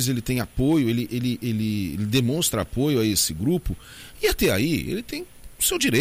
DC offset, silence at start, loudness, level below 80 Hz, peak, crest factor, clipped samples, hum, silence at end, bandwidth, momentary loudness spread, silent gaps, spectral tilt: under 0.1%; 0 s; -23 LUFS; -40 dBFS; -8 dBFS; 16 dB; under 0.1%; none; 0 s; 16 kHz; 11 LU; none; -4.5 dB/octave